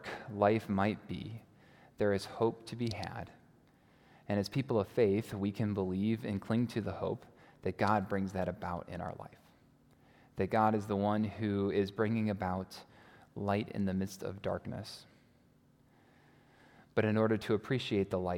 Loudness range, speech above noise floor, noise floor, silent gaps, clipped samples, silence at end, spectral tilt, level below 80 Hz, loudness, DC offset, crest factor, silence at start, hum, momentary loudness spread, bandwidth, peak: 6 LU; 33 dB; -66 dBFS; none; under 0.1%; 0 s; -7 dB/octave; -68 dBFS; -35 LUFS; under 0.1%; 22 dB; 0 s; none; 13 LU; 17 kHz; -14 dBFS